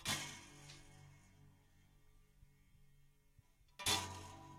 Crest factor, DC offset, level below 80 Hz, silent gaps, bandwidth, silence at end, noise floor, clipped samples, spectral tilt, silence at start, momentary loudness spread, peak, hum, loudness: 28 dB; under 0.1%; -70 dBFS; none; 16 kHz; 0 s; -70 dBFS; under 0.1%; -1.5 dB/octave; 0 s; 25 LU; -22 dBFS; none; -41 LUFS